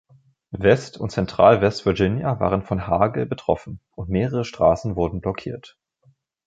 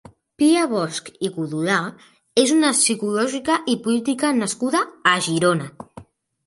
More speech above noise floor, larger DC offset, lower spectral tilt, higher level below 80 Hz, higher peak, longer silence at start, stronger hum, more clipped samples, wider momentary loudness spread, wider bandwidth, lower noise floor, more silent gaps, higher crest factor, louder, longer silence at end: first, 40 dB vs 25 dB; neither; first, -7 dB/octave vs -3.5 dB/octave; first, -42 dBFS vs -64 dBFS; about the same, -2 dBFS vs -2 dBFS; about the same, 0.5 s vs 0.4 s; neither; neither; first, 14 LU vs 10 LU; second, 8.6 kHz vs 11.5 kHz; first, -61 dBFS vs -45 dBFS; neither; about the same, 20 dB vs 18 dB; about the same, -21 LUFS vs -20 LUFS; first, 0.8 s vs 0.45 s